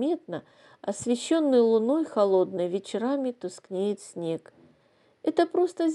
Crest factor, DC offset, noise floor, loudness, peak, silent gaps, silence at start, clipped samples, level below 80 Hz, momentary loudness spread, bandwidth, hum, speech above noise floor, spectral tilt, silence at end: 18 dB; under 0.1%; -64 dBFS; -26 LUFS; -8 dBFS; none; 0 s; under 0.1%; -76 dBFS; 13 LU; 11.5 kHz; none; 38 dB; -5.5 dB/octave; 0 s